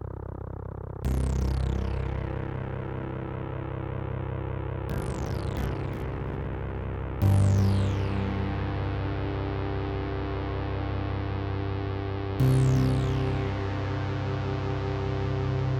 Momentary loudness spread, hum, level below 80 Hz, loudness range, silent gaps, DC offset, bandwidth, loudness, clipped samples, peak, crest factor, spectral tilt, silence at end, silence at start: 10 LU; none; -36 dBFS; 5 LU; none; under 0.1%; 16.5 kHz; -30 LUFS; under 0.1%; -12 dBFS; 16 dB; -7.5 dB/octave; 0 s; 0 s